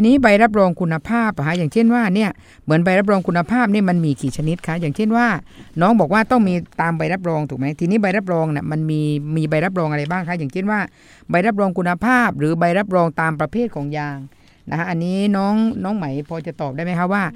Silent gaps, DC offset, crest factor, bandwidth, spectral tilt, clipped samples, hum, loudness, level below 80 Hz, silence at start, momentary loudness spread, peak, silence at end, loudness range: none; under 0.1%; 18 dB; 13 kHz; -7.5 dB/octave; under 0.1%; none; -18 LUFS; -48 dBFS; 0 s; 9 LU; 0 dBFS; 0 s; 4 LU